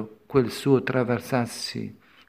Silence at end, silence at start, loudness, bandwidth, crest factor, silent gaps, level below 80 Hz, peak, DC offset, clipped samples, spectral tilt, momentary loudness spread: 0.35 s; 0 s; -25 LUFS; 16 kHz; 18 dB; none; -58 dBFS; -6 dBFS; under 0.1%; under 0.1%; -6 dB/octave; 11 LU